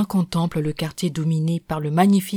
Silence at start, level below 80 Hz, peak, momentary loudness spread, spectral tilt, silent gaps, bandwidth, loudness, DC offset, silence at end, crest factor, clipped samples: 0 s; -50 dBFS; -4 dBFS; 8 LU; -6.5 dB/octave; none; 19.5 kHz; -22 LUFS; under 0.1%; 0 s; 16 dB; under 0.1%